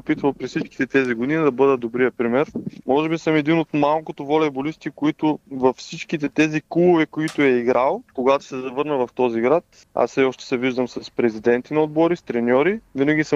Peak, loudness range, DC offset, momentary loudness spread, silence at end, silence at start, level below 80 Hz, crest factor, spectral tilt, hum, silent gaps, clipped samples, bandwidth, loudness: -4 dBFS; 2 LU; under 0.1%; 8 LU; 0 s; 0.05 s; -60 dBFS; 16 dB; -6.5 dB/octave; none; none; under 0.1%; 10 kHz; -21 LUFS